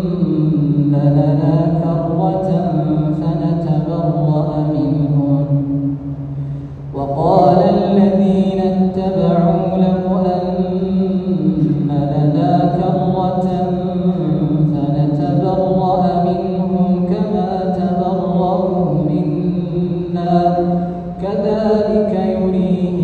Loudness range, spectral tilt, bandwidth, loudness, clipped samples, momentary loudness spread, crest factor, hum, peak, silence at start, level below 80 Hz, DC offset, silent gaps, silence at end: 3 LU; -10.5 dB/octave; 4.8 kHz; -16 LUFS; under 0.1%; 5 LU; 14 dB; none; 0 dBFS; 0 s; -40 dBFS; under 0.1%; none; 0 s